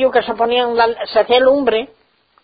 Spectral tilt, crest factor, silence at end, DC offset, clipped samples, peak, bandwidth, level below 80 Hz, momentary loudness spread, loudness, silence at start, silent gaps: -9 dB/octave; 14 dB; 0.6 s; under 0.1%; under 0.1%; -2 dBFS; 5 kHz; -52 dBFS; 7 LU; -15 LUFS; 0 s; none